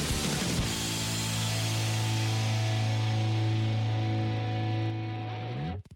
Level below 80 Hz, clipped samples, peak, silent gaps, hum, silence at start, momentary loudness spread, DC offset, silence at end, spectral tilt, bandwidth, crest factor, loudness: -46 dBFS; under 0.1%; -22 dBFS; none; none; 0 s; 6 LU; under 0.1%; 0 s; -4.5 dB/octave; 17 kHz; 8 dB; -30 LUFS